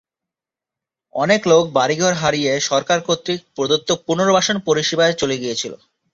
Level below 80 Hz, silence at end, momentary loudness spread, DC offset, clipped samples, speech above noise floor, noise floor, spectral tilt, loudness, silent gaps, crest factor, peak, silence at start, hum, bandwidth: -58 dBFS; 0.4 s; 8 LU; under 0.1%; under 0.1%; 70 dB; -87 dBFS; -3.5 dB/octave; -17 LUFS; none; 16 dB; -2 dBFS; 1.15 s; none; 7.8 kHz